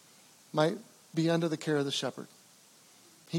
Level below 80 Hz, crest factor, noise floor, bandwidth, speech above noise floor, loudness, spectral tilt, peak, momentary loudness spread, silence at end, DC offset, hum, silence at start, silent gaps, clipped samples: under -90 dBFS; 22 dB; -60 dBFS; 16.5 kHz; 29 dB; -32 LUFS; -5.5 dB/octave; -12 dBFS; 14 LU; 0 s; under 0.1%; none; 0.55 s; none; under 0.1%